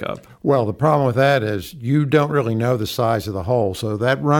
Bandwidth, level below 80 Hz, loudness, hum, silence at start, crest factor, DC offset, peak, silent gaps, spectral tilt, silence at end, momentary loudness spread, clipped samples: 18.5 kHz; -50 dBFS; -19 LUFS; none; 0 s; 16 dB; under 0.1%; -2 dBFS; none; -7 dB/octave; 0 s; 6 LU; under 0.1%